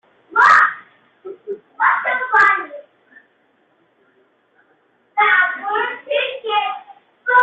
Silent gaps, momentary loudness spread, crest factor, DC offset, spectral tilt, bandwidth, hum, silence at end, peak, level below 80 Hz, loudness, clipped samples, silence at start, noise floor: none; 21 LU; 18 dB; under 0.1%; -1.5 dB/octave; 8.4 kHz; none; 0 s; -2 dBFS; -66 dBFS; -16 LUFS; under 0.1%; 0.3 s; -60 dBFS